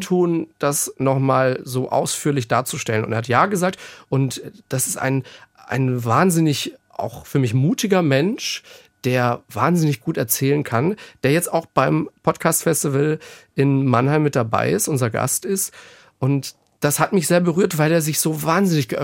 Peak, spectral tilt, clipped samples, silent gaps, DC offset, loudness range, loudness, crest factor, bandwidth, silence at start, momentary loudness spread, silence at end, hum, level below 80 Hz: -2 dBFS; -5 dB/octave; under 0.1%; none; under 0.1%; 2 LU; -20 LUFS; 18 dB; 17 kHz; 0 s; 8 LU; 0 s; none; -60 dBFS